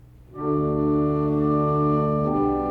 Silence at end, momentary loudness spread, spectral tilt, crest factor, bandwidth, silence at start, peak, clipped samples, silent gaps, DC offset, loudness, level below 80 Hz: 0 s; 3 LU; -11.5 dB/octave; 12 dB; 4.4 kHz; 0.3 s; -10 dBFS; under 0.1%; none; under 0.1%; -22 LUFS; -42 dBFS